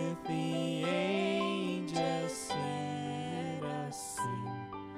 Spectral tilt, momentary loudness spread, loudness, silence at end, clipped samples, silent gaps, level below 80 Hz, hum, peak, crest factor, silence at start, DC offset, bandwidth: -5 dB/octave; 7 LU; -35 LUFS; 0 s; under 0.1%; none; -68 dBFS; none; -20 dBFS; 14 dB; 0 s; under 0.1%; 15.5 kHz